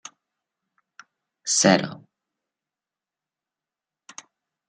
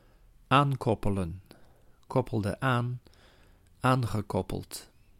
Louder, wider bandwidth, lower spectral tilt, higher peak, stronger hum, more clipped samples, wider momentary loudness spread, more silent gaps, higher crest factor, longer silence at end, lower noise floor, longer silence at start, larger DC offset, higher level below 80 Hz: first, -20 LUFS vs -29 LUFS; second, 10 kHz vs 16 kHz; second, -3 dB/octave vs -6.5 dB/octave; first, -2 dBFS vs -8 dBFS; neither; neither; first, 27 LU vs 15 LU; neither; first, 28 dB vs 22 dB; first, 2.7 s vs 0.35 s; first, -90 dBFS vs -59 dBFS; first, 1.45 s vs 0.5 s; neither; second, -74 dBFS vs -48 dBFS